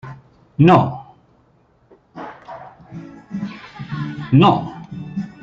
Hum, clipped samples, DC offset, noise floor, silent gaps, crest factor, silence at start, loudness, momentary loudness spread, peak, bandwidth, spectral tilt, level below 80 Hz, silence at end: none; under 0.1%; under 0.1%; -56 dBFS; none; 18 dB; 0.05 s; -17 LUFS; 24 LU; -2 dBFS; 7.2 kHz; -9 dB/octave; -54 dBFS; 0.15 s